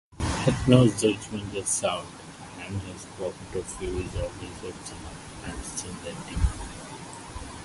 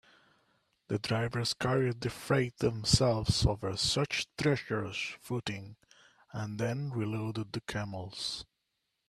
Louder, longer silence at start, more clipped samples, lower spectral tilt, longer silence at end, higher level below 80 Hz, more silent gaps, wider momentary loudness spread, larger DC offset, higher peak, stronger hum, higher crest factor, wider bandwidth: first, -28 LUFS vs -32 LUFS; second, 0.1 s vs 0.9 s; neither; about the same, -5 dB/octave vs -4.5 dB/octave; second, 0 s vs 0.65 s; first, -40 dBFS vs -50 dBFS; neither; first, 18 LU vs 11 LU; neither; first, -4 dBFS vs -12 dBFS; neither; about the same, 26 dB vs 22 dB; second, 11.5 kHz vs 13.5 kHz